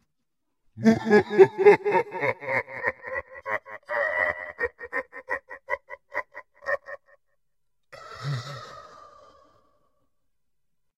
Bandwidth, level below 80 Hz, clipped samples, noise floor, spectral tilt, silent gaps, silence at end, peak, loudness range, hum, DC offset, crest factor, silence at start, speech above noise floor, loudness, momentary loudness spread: 8.2 kHz; -64 dBFS; under 0.1%; -83 dBFS; -6.5 dB/octave; none; 2.15 s; -2 dBFS; 18 LU; none; under 0.1%; 24 dB; 0.75 s; 63 dB; -25 LUFS; 20 LU